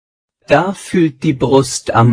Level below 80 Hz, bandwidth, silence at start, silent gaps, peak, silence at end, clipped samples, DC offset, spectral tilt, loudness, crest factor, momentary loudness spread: -44 dBFS; 10.5 kHz; 0.5 s; none; 0 dBFS; 0 s; 0.2%; under 0.1%; -6 dB/octave; -14 LUFS; 14 dB; 4 LU